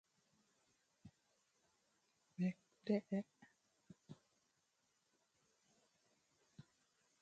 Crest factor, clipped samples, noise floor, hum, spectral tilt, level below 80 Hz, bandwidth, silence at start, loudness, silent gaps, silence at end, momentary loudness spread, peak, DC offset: 24 dB; under 0.1%; -84 dBFS; none; -8 dB/octave; -90 dBFS; 8.8 kHz; 1.05 s; -44 LUFS; none; 0.6 s; 25 LU; -26 dBFS; under 0.1%